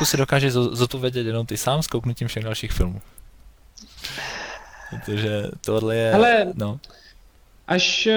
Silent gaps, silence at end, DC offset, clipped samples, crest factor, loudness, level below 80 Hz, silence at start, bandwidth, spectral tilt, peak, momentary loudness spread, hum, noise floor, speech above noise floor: none; 0 s; under 0.1%; under 0.1%; 18 dB; -22 LUFS; -38 dBFS; 0 s; over 20 kHz; -4.5 dB/octave; -6 dBFS; 17 LU; none; -52 dBFS; 30 dB